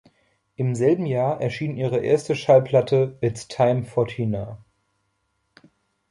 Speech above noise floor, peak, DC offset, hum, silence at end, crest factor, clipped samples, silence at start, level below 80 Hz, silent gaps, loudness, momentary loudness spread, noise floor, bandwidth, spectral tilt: 51 dB; -4 dBFS; under 0.1%; none; 1.55 s; 18 dB; under 0.1%; 0.6 s; -56 dBFS; none; -22 LUFS; 9 LU; -72 dBFS; 11.5 kHz; -7 dB/octave